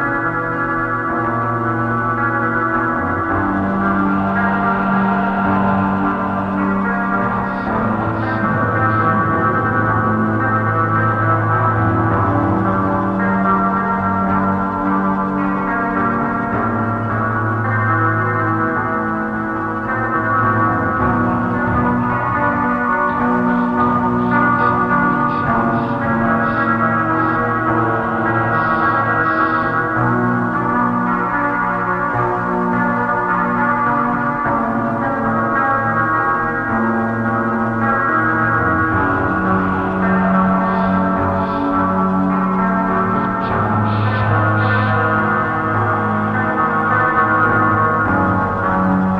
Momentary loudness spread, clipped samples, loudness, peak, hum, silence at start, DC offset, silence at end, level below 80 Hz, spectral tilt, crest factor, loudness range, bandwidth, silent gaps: 3 LU; under 0.1%; -16 LUFS; -2 dBFS; none; 0 s; under 0.1%; 0 s; -40 dBFS; -9.5 dB/octave; 14 dB; 2 LU; 5.8 kHz; none